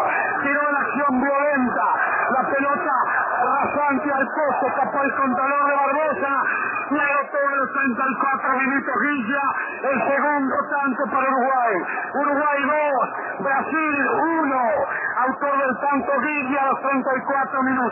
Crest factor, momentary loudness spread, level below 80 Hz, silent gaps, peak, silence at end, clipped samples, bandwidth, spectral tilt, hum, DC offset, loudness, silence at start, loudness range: 14 dB; 3 LU; -64 dBFS; none; -8 dBFS; 0 s; under 0.1%; 3.1 kHz; -9 dB/octave; none; under 0.1%; -21 LUFS; 0 s; 1 LU